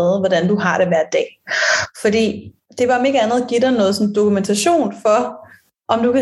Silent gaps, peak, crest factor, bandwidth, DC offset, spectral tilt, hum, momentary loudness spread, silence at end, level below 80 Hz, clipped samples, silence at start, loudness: none; -2 dBFS; 14 dB; 12.5 kHz; under 0.1%; -4.5 dB/octave; none; 6 LU; 0 s; -58 dBFS; under 0.1%; 0 s; -16 LUFS